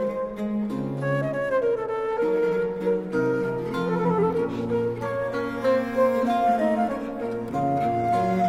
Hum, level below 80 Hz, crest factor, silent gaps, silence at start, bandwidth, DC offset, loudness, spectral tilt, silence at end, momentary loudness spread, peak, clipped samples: none; -54 dBFS; 14 dB; none; 0 s; 14 kHz; under 0.1%; -25 LUFS; -8 dB/octave; 0 s; 6 LU; -10 dBFS; under 0.1%